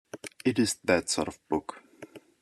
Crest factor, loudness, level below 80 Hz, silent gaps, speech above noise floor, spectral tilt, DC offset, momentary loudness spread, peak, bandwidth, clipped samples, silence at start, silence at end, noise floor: 22 dB; -29 LUFS; -64 dBFS; none; 22 dB; -3.5 dB/octave; under 0.1%; 23 LU; -8 dBFS; 13 kHz; under 0.1%; 0.15 s; 0.25 s; -50 dBFS